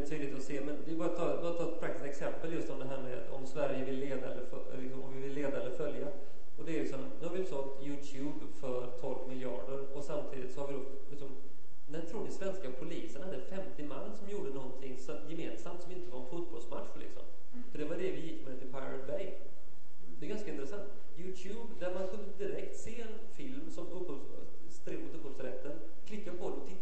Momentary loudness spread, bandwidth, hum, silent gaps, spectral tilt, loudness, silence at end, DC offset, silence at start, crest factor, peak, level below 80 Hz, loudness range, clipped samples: 11 LU; 8.4 kHz; none; none; -6.5 dB/octave; -42 LUFS; 0 s; 5%; 0 s; 20 dB; -18 dBFS; -62 dBFS; 6 LU; under 0.1%